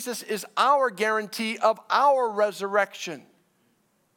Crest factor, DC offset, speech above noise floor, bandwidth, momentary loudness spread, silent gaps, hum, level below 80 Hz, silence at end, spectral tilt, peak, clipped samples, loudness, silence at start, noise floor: 18 dB; under 0.1%; 44 dB; 17.5 kHz; 10 LU; none; none; -84 dBFS; 1 s; -3 dB/octave; -8 dBFS; under 0.1%; -24 LUFS; 0 s; -68 dBFS